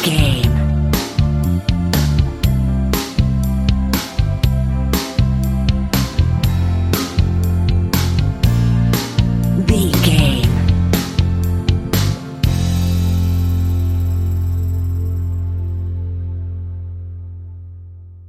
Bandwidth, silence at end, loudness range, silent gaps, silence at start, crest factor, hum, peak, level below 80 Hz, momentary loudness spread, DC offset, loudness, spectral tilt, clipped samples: 16 kHz; 0 s; 5 LU; none; 0 s; 16 dB; none; 0 dBFS; -22 dBFS; 10 LU; under 0.1%; -17 LUFS; -6 dB/octave; under 0.1%